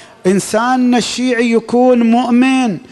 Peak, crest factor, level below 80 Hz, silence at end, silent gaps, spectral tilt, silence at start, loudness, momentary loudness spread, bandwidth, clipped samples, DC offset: -2 dBFS; 10 dB; -54 dBFS; 0.1 s; none; -5 dB/octave; 0 s; -12 LUFS; 5 LU; 12 kHz; under 0.1%; under 0.1%